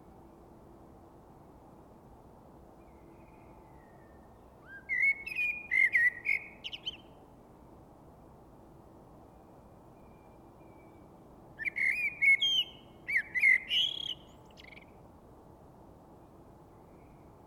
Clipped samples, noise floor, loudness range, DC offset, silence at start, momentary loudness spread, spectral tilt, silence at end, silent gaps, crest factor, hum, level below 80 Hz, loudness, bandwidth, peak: under 0.1%; -56 dBFS; 15 LU; under 0.1%; 2.05 s; 27 LU; -1.5 dB/octave; 2.4 s; none; 20 dB; none; -64 dBFS; -28 LUFS; 17 kHz; -16 dBFS